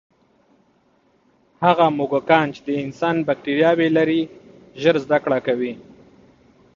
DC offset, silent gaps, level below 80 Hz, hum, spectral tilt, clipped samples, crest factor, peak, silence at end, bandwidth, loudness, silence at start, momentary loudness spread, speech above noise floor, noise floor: under 0.1%; none; -62 dBFS; none; -7 dB/octave; under 0.1%; 20 dB; 0 dBFS; 0.95 s; 7.2 kHz; -19 LUFS; 1.6 s; 9 LU; 42 dB; -60 dBFS